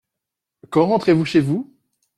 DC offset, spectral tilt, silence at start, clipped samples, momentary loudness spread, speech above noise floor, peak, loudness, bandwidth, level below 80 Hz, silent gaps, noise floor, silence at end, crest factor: under 0.1%; -7.5 dB/octave; 0.7 s; under 0.1%; 9 LU; 67 dB; -4 dBFS; -18 LUFS; 11.5 kHz; -58 dBFS; none; -83 dBFS; 0.55 s; 16 dB